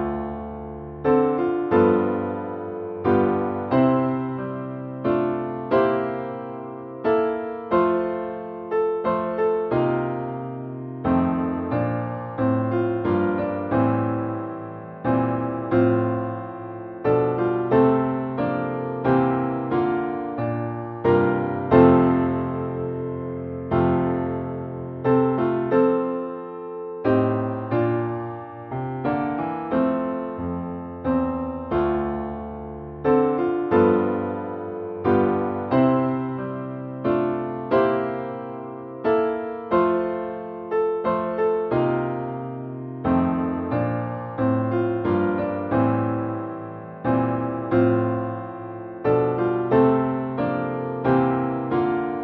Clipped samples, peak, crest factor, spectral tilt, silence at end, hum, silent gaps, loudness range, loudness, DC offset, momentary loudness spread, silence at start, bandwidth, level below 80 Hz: under 0.1%; -2 dBFS; 20 dB; -11 dB/octave; 0 s; none; none; 4 LU; -23 LUFS; under 0.1%; 12 LU; 0 s; 4.7 kHz; -50 dBFS